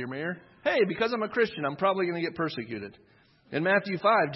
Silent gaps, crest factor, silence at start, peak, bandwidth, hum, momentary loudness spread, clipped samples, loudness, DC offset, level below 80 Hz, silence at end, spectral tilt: none; 18 dB; 0 s; -10 dBFS; 6 kHz; none; 11 LU; under 0.1%; -28 LUFS; under 0.1%; -70 dBFS; 0 s; -7.5 dB/octave